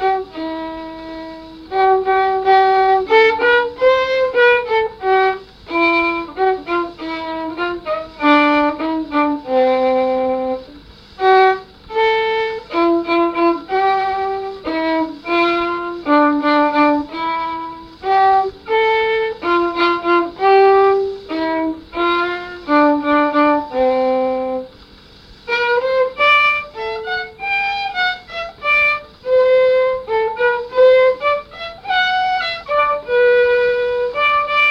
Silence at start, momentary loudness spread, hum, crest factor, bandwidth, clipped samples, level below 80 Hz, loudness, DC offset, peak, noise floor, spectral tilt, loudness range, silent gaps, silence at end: 0 s; 12 LU; 50 Hz at -50 dBFS; 14 dB; 7 kHz; under 0.1%; -48 dBFS; -16 LUFS; under 0.1%; -2 dBFS; -43 dBFS; -5 dB/octave; 3 LU; none; 0 s